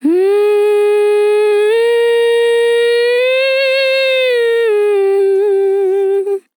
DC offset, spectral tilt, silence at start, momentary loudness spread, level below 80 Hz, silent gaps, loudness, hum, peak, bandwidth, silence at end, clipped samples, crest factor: under 0.1%; -1.5 dB/octave; 0.05 s; 1 LU; under -90 dBFS; none; -12 LUFS; none; -4 dBFS; 17.5 kHz; 0.2 s; under 0.1%; 8 dB